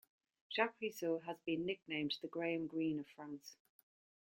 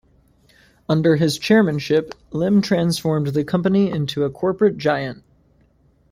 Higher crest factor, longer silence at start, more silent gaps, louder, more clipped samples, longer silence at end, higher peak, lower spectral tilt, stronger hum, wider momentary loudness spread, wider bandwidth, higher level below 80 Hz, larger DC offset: first, 24 dB vs 16 dB; second, 0.5 s vs 0.9 s; neither; second, -41 LUFS vs -19 LUFS; neither; second, 0.75 s vs 0.95 s; second, -20 dBFS vs -2 dBFS; second, -5 dB/octave vs -6.5 dB/octave; neither; first, 13 LU vs 7 LU; about the same, 16.5 kHz vs 15.5 kHz; second, -82 dBFS vs -54 dBFS; neither